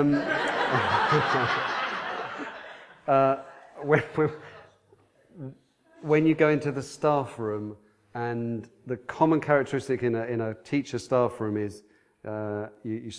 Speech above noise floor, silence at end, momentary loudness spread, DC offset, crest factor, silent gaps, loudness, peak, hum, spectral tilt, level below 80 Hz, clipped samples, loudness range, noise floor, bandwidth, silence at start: 36 dB; 0 s; 17 LU; under 0.1%; 22 dB; none; -27 LUFS; -6 dBFS; none; -6.5 dB/octave; -64 dBFS; under 0.1%; 3 LU; -61 dBFS; 11 kHz; 0 s